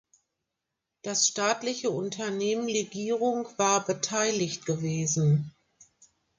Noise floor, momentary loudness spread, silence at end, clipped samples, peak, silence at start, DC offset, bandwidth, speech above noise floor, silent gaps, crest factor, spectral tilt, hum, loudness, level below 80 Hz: -85 dBFS; 6 LU; 0.9 s; under 0.1%; -12 dBFS; 1.05 s; under 0.1%; 10 kHz; 57 dB; none; 18 dB; -4 dB/octave; none; -27 LUFS; -70 dBFS